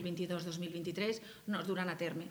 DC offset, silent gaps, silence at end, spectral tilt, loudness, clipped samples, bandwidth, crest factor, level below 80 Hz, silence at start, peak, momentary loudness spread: under 0.1%; none; 0 s; -5.5 dB/octave; -39 LUFS; under 0.1%; over 20 kHz; 16 dB; -76 dBFS; 0 s; -22 dBFS; 4 LU